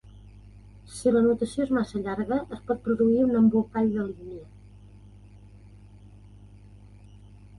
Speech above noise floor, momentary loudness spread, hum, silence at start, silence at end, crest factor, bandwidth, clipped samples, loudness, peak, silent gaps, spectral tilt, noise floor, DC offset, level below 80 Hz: 25 dB; 15 LU; 50 Hz at -45 dBFS; 0.05 s; 0 s; 16 dB; 11.5 kHz; under 0.1%; -25 LUFS; -12 dBFS; none; -7.5 dB/octave; -49 dBFS; under 0.1%; -52 dBFS